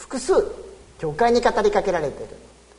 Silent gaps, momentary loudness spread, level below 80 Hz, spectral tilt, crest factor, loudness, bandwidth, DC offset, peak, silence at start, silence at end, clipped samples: none; 19 LU; -44 dBFS; -4.5 dB/octave; 18 dB; -21 LUFS; 11 kHz; under 0.1%; -6 dBFS; 0 s; 0.4 s; under 0.1%